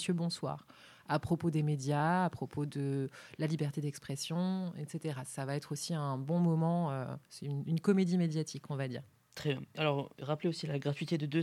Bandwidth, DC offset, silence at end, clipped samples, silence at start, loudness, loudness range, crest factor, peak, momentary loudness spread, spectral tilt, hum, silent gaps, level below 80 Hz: 13.5 kHz; under 0.1%; 0 s; under 0.1%; 0 s; -35 LUFS; 4 LU; 18 dB; -16 dBFS; 10 LU; -6.5 dB/octave; none; none; -70 dBFS